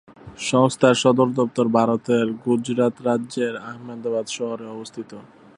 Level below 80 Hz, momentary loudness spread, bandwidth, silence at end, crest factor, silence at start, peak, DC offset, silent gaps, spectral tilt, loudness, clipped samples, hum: -64 dBFS; 17 LU; 11 kHz; 0.35 s; 20 dB; 0.1 s; -2 dBFS; under 0.1%; none; -5.5 dB/octave; -21 LUFS; under 0.1%; none